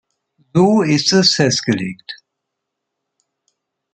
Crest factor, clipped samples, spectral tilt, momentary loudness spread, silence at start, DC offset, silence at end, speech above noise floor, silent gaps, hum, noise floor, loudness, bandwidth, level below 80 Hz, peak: 16 dB; under 0.1%; -4.5 dB/octave; 21 LU; 0.55 s; under 0.1%; 1.8 s; 64 dB; none; none; -78 dBFS; -14 LUFS; 9.2 kHz; -58 dBFS; -2 dBFS